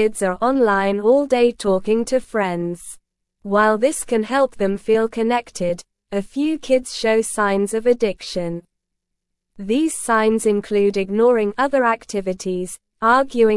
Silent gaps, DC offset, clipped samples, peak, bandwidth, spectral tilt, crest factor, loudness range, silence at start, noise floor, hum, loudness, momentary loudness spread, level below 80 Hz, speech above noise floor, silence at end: none; under 0.1%; under 0.1%; -4 dBFS; 12 kHz; -4.5 dB/octave; 16 dB; 2 LU; 0 s; -78 dBFS; none; -19 LUFS; 10 LU; -50 dBFS; 60 dB; 0 s